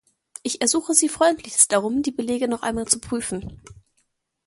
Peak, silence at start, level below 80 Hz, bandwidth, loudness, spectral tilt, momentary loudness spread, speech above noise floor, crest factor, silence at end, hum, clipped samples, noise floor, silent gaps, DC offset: -2 dBFS; 0.45 s; -52 dBFS; 12 kHz; -21 LUFS; -2.5 dB/octave; 13 LU; 48 dB; 22 dB; 0.75 s; none; under 0.1%; -71 dBFS; none; under 0.1%